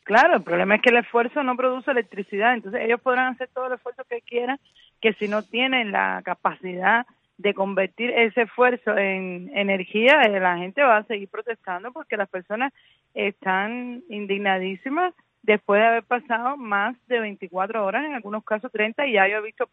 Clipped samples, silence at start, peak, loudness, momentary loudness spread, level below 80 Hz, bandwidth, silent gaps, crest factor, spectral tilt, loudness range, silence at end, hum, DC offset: under 0.1%; 0.05 s; -2 dBFS; -22 LUFS; 12 LU; -74 dBFS; 8.4 kHz; none; 20 dB; -6 dB/octave; 5 LU; 0.05 s; none; under 0.1%